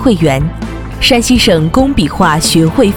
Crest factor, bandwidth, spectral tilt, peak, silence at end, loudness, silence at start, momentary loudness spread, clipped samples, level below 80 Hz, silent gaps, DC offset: 10 dB; 19 kHz; -4.5 dB/octave; 0 dBFS; 0 s; -10 LUFS; 0 s; 9 LU; under 0.1%; -24 dBFS; none; under 0.1%